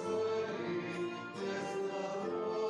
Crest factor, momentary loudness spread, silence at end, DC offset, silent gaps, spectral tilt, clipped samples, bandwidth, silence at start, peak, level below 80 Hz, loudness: 12 dB; 5 LU; 0 s; under 0.1%; none; -5.5 dB/octave; under 0.1%; 11 kHz; 0 s; -26 dBFS; -78 dBFS; -38 LUFS